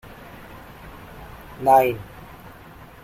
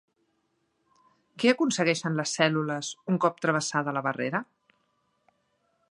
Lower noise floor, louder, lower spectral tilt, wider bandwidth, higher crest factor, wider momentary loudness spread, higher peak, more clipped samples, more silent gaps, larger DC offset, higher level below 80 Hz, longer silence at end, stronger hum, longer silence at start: second, -44 dBFS vs -74 dBFS; first, -19 LUFS vs -27 LUFS; first, -6 dB/octave vs -4.5 dB/octave; first, 16 kHz vs 11 kHz; about the same, 22 dB vs 24 dB; first, 26 LU vs 7 LU; about the same, -4 dBFS vs -6 dBFS; neither; neither; neither; first, -48 dBFS vs -78 dBFS; second, 1 s vs 1.45 s; neither; second, 0.85 s vs 1.35 s